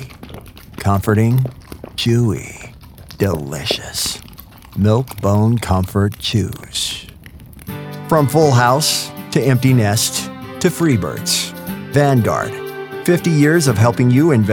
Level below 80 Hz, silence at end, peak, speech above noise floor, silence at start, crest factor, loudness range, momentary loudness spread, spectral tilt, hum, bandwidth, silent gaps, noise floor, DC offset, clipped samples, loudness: -42 dBFS; 0 s; 0 dBFS; 24 dB; 0 s; 16 dB; 4 LU; 17 LU; -5 dB/octave; none; 18.5 kHz; none; -38 dBFS; under 0.1%; under 0.1%; -16 LUFS